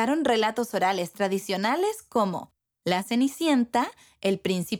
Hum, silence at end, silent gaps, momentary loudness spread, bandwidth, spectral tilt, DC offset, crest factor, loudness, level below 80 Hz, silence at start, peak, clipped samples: none; 0 s; none; 6 LU; over 20 kHz; -4.5 dB/octave; under 0.1%; 18 dB; -26 LUFS; -68 dBFS; 0 s; -8 dBFS; under 0.1%